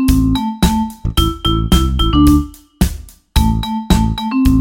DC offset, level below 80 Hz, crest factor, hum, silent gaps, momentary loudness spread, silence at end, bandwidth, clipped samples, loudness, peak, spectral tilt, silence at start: under 0.1%; -18 dBFS; 14 dB; none; none; 7 LU; 0 s; 17 kHz; under 0.1%; -15 LUFS; 0 dBFS; -5.5 dB/octave; 0 s